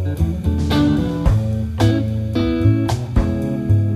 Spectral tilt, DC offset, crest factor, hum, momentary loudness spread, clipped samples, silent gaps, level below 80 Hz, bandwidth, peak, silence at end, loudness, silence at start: -7.5 dB/octave; under 0.1%; 14 dB; none; 4 LU; under 0.1%; none; -26 dBFS; 13.5 kHz; -2 dBFS; 0 s; -18 LUFS; 0 s